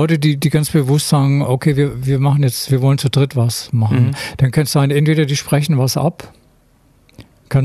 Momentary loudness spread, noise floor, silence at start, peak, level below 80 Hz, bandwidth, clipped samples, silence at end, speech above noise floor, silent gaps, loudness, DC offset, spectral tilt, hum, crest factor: 4 LU; -52 dBFS; 0 s; -2 dBFS; -44 dBFS; 14 kHz; under 0.1%; 0 s; 38 dB; none; -15 LUFS; under 0.1%; -6 dB/octave; none; 12 dB